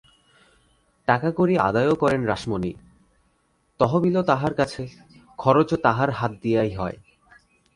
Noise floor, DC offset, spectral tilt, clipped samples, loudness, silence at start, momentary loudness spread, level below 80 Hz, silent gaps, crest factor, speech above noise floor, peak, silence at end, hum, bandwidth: -67 dBFS; under 0.1%; -7.5 dB/octave; under 0.1%; -22 LUFS; 1.1 s; 11 LU; -52 dBFS; none; 20 dB; 45 dB; -2 dBFS; 0.8 s; none; 11.5 kHz